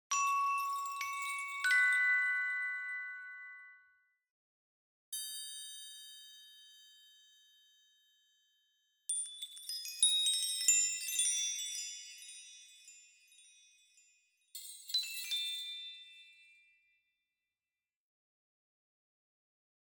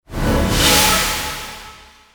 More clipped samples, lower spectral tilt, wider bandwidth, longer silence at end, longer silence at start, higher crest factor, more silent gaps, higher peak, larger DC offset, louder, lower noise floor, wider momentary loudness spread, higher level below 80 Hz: neither; second, 8 dB/octave vs -2.5 dB/octave; about the same, over 20 kHz vs over 20 kHz; first, 3.7 s vs 0.4 s; about the same, 0.1 s vs 0.1 s; first, 24 dB vs 16 dB; first, 4.30-5.12 s vs none; second, -16 dBFS vs -2 dBFS; neither; second, -33 LUFS vs -15 LUFS; first, under -90 dBFS vs -41 dBFS; first, 23 LU vs 18 LU; second, under -90 dBFS vs -28 dBFS